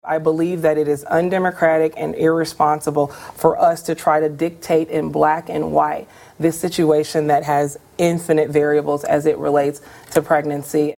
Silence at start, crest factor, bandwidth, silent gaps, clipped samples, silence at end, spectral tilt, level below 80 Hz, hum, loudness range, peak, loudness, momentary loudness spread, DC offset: 0.05 s; 18 dB; 17 kHz; none; under 0.1%; 0.05 s; -6 dB/octave; -56 dBFS; none; 1 LU; 0 dBFS; -18 LUFS; 5 LU; under 0.1%